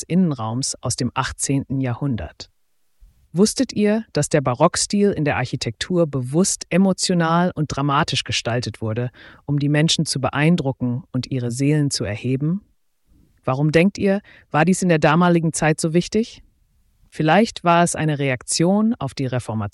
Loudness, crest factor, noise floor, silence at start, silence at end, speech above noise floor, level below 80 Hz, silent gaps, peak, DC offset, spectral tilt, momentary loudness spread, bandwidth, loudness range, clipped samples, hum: -20 LUFS; 16 dB; -60 dBFS; 0 s; 0.05 s; 41 dB; -48 dBFS; none; -4 dBFS; under 0.1%; -5 dB/octave; 9 LU; 12 kHz; 4 LU; under 0.1%; none